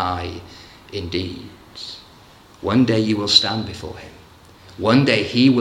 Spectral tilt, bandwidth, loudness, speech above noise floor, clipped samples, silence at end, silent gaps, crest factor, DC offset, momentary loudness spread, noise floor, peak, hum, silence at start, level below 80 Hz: -5 dB/octave; 12 kHz; -18 LUFS; 28 dB; under 0.1%; 0 s; none; 20 dB; under 0.1%; 22 LU; -47 dBFS; 0 dBFS; none; 0 s; -50 dBFS